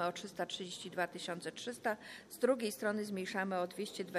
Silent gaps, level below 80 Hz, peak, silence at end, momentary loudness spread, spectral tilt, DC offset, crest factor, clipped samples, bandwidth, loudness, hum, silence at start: none; -80 dBFS; -20 dBFS; 0 s; 8 LU; -4 dB/octave; under 0.1%; 20 dB; under 0.1%; 15 kHz; -39 LUFS; none; 0 s